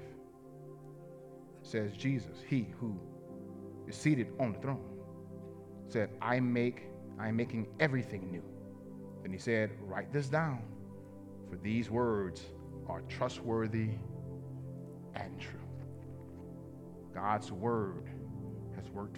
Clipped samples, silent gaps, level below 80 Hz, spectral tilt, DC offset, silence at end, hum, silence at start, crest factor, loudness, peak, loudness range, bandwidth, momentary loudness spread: under 0.1%; none; -68 dBFS; -7 dB/octave; under 0.1%; 0 s; none; 0 s; 24 dB; -38 LUFS; -14 dBFS; 5 LU; 12.5 kHz; 17 LU